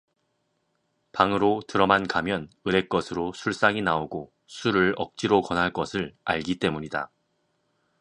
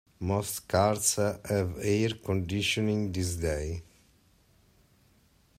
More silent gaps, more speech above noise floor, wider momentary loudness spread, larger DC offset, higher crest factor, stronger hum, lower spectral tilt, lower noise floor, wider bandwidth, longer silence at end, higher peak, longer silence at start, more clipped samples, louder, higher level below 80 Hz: neither; first, 49 dB vs 35 dB; first, 10 LU vs 6 LU; neither; about the same, 24 dB vs 20 dB; neither; about the same, -5.5 dB/octave vs -4.5 dB/octave; first, -74 dBFS vs -64 dBFS; second, 10.5 kHz vs 16 kHz; second, 0.95 s vs 1.75 s; first, -2 dBFS vs -10 dBFS; first, 1.15 s vs 0.2 s; neither; first, -25 LUFS vs -29 LUFS; about the same, -54 dBFS vs -52 dBFS